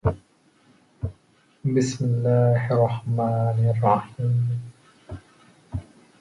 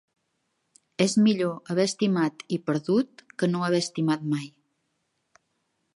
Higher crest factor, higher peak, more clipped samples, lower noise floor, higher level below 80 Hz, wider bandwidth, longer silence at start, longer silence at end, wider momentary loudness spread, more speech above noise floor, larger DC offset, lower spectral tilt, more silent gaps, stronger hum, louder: about the same, 18 dB vs 20 dB; about the same, -6 dBFS vs -8 dBFS; neither; second, -60 dBFS vs -76 dBFS; first, -46 dBFS vs -74 dBFS; about the same, 10.5 kHz vs 11.5 kHz; second, 0.05 s vs 1 s; second, 0.4 s vs 1.45 s; first, 21 LU vs 10 LU; second, 38 dB vs 51 dB; neither; first, -8 dB/octave vs -5.5 dB/octave; neither; neither; first, -23 LUFS vs -26 LUFS